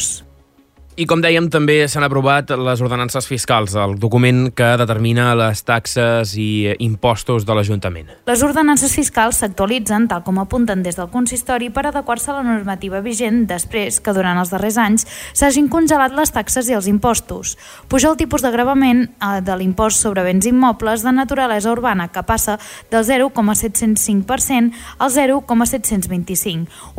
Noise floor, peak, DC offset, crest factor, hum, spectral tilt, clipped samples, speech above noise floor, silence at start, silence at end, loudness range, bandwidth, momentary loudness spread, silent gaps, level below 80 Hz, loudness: -50 dBFS; -2 dBFS; under 0.1%; 14 dB; none; -4.5 dB/octave; under 0.1%; 34 dB; 0 s; 0 s; 3 LU; 16.5 kHz; 7 LU; none; -38 dBFS; -16 LUFS